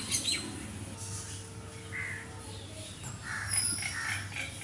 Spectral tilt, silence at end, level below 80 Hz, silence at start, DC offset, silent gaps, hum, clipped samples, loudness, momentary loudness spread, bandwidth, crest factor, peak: -1.5 dB/octave; 0 s; -58 dBFS; 0 s; under 0.1%; none; none; under 0.1%; -35 LUFS; 14 LU; 11.5 kHz; 22 dB; -14 dBFS